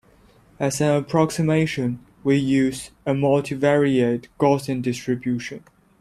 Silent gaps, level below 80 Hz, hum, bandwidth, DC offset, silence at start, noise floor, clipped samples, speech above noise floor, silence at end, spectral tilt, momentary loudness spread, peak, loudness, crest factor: none; -54 dBFS; none; 14.5 kHz; under 0.1%; 0.6 s; -54 dBFS; under 0.1%; 33 dB; 0.45 s; -6.5 dB/octave; 9 LU; -4 dBFS; -22 LUFS; 18 dB